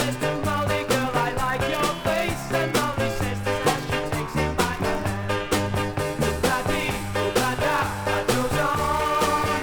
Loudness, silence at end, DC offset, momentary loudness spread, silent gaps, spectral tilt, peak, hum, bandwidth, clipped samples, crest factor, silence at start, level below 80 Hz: -24 LUFS; 0 s; under 0.1%; 3 LU; none; -4.5 dB/octave; -8 dBFS; none; 19.5 kHz; under 0.1%; 16 dB; 0 s; -40 dBFS